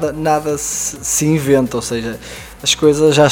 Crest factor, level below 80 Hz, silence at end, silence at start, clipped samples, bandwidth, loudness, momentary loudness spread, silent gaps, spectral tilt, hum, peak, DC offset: 16 dB; -42 dBFS; 0 s; 0 s; under 0.1%; 17 kHz; -15 LUFS; 12 LU; none; -4 dB/octave; none; 0 dBFS; under 0.1%